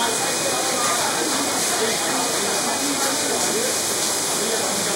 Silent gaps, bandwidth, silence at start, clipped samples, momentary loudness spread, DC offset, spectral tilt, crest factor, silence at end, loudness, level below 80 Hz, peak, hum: none; 16 kHz; 0 s; under 0.1%; 1 LU; under 0.1%; -1 dB/octave; 14 dB; 0 s; -20 LUFS; -62 dBFS; -8 dBFS; none